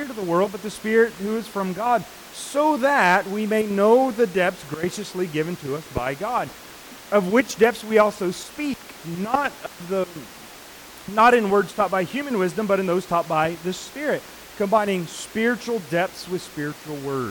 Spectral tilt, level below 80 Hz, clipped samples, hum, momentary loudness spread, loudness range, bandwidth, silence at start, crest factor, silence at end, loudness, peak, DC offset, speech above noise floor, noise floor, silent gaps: -5 dB/octave; -56 dBFS; under 0.1%; none; 14 LU; 5 LU; 19 kHz; 0 s; 18 dB; 0 s; -22 LUFS; -6 dBFS; under 0.1%; 20 dB; -42 dBFS; none